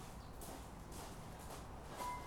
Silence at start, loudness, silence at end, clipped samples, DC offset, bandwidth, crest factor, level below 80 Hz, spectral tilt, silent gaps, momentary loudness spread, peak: 0 s; -51 LUFS; 0 s; under 0.1%; under 0.1%; 19 kHz; 16 dB; -56 dBFS; -4.5 dB/octave; none; 5 LU; -34 dBFS